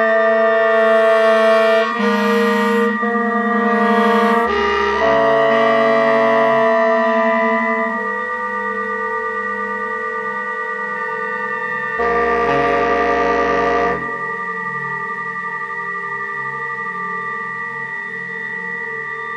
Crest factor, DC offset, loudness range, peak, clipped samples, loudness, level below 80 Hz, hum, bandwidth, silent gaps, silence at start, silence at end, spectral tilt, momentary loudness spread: 14 dB; under 0.1%; 8 LU; -2 dBFS; under 0.1%; -17 LUFS; -48 dBFS; none; 13 kHz; none; 0 s; 0 s; -5.5 dB/octave; 9 LU